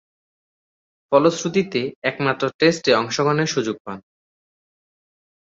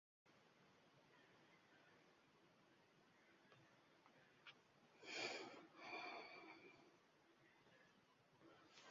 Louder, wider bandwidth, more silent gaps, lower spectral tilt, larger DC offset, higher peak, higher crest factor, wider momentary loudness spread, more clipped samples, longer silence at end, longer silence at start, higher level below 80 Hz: first, -20 LUFS vs -54 LUFS; about the same, 7.8 kHz vs 7.2 kHz; first, 1.96-2.02 s, 2.54-2.59 s, 3.80-3.85 s vs none; first, -4.5 dB/octave vs -0.5 dB/octave; neither; first, -2 dBFS vs -34 dBFS; second, 20 dB vs 28 dB; second, 10 LU vs 17 LU; neither; first, 1.45 s vs 0 s; first, 1.1 s vs 0.25 s; first, -64 dBFS vs under -90 dBFS